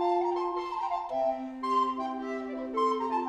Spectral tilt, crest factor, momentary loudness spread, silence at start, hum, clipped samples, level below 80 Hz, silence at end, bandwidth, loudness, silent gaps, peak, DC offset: -4.5 dB/octave; 14 dB; 6 LU; 0 s; none; under 0.1%; -66 dBFS; 0 s; 10 kHz; -31 LUFS; none; -16 dBFS; under 0.1%